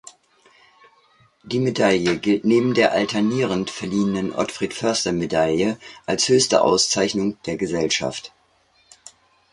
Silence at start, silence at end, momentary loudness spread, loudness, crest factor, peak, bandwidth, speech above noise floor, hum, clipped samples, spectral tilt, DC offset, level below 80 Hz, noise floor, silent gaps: 0.05 s; 1.25 s; 9 LU; -20 LUFS; 18 dB; -4 dBFS; 11.5 kHz; 40 dB; none; under 0.1%; -4 dB/octave; under 0.1%; -54 dBFS; -60 dBFS; none